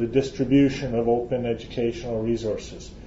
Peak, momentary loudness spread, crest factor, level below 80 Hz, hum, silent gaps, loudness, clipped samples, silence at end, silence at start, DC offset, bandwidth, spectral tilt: -8 dBFS; 9 LU; 16 dB; -44 dBFS; none; none; -24 LUFS; under 0.1%; 0 s; 0 s; under 0.1%; 7.8 kHz; -7 dB/octave